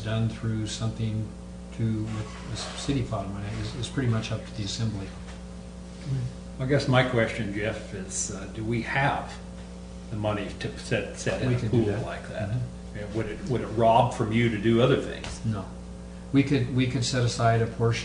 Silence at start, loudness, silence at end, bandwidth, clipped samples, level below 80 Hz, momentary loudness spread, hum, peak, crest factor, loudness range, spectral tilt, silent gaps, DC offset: 0 s; -28 LUFS; 0 s; 10 kHz; under 0.1%; -44 dBFS; 16 LU; none; -8 dBFS; 20 dB; 6 LU; -5.5 dB/octave; none; under 0.1%